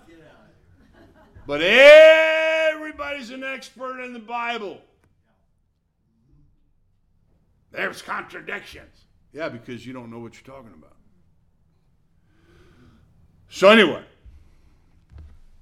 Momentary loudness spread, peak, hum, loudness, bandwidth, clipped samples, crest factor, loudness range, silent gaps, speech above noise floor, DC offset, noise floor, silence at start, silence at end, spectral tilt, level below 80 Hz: 27 LU; 0 dBFS; none; -16 LUFS; 12.5 kHz; under 0.1%; 22 dB; 22 LU; none; 50 dB; under 0.1%; -68 dBFS; 1.5 s; 1.65 s; -3.5 dB/octave; -56 dBFS